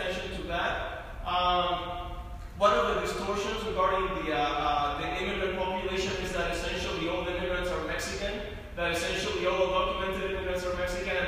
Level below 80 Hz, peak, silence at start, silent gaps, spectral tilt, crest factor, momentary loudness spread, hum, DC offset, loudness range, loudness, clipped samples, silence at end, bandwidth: -42 dBFS; -12 dBFS; 0 s; none; -4 dB/octave; 18 dB; 8 LU; none; under 0.1%; 3 LU; -30 LUFS; under 0.1%; 0 s; 15.5 kHz